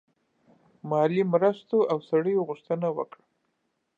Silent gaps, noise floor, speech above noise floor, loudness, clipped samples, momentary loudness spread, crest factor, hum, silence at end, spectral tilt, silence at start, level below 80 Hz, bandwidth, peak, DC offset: none; -76 dBFS; 51 dB; -26 LUFS; under 0.1%; 10 LU; 18 dB; none; 0.95 s; -9 dB/octave; 0.85 s; -82 dBFS; 7.2 kHz; -8 dBFS; under 0.1%